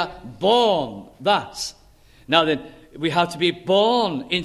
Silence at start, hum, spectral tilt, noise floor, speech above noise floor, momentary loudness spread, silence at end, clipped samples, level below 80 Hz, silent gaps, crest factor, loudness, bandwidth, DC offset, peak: 0 s; none; -4.5 dB/octave; -51 dBFS; 31 dB; 12 LU; 0 s; under 0.1%; -54 dBFS; none; 20 dB; -21 LUFS; 13.5 kHz; under 0.1%; -2 dBFS